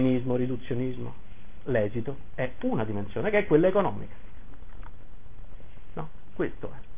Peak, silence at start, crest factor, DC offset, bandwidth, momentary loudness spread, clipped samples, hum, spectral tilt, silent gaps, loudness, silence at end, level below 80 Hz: -10 dBFS; 0 s; 20 dB; 3%; 3.7 kHz; 20 LU; under 0.1%; none; -11 dB/octave; none; -28 LUFS; 0 s; -48 dBFS